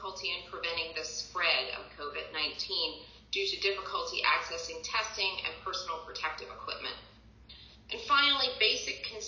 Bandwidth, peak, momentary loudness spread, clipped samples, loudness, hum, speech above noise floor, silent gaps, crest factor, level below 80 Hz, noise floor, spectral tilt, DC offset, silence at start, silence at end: 7.4 kHz; -14 dBFS; 14 LU; under 0.1%; -31 LUFS; none; 21 dB; none; 22 dB; -60 dBFS; -54 dBFS; -0.5 dB/octave; under 0.1%; 0 s; 0 s